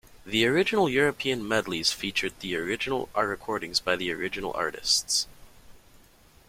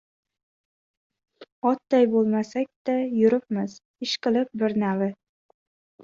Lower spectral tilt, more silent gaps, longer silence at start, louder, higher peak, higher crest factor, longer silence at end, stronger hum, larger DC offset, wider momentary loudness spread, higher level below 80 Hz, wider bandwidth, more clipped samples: second, -2.5 dB/octave vs -6 dB/octave; second, none vs 1.52-1.62 s, 2.76-2.85 s, 3.85-3.94 s; second, 0.15 s vs 1.4 s; about the same, -26 LUFS vs -24 LUFS; about the same, -8 dBFS vs -8 dBFS; about the same, 22 dB vs 18 dB; second, 0.7 s vs 0.9 s; neither; neither; about the same, 8 LU vs 9 LU; first, -56 dBFS vs -72 dBFS; first, 16.5 kHz vs 7.4 kHz; neither